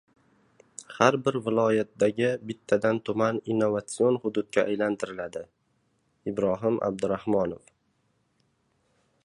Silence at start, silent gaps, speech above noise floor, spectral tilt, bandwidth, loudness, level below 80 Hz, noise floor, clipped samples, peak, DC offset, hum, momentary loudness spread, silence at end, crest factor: 0.8 s; none; 45 dB; -6 dB/octave; 11.5 kHz; -27 LUFS; -64 dBFS; -71 dBFS; under 0.1%; -4 dBFS; under 0.1%; none; 13 LU; 1.7 s; 24 dB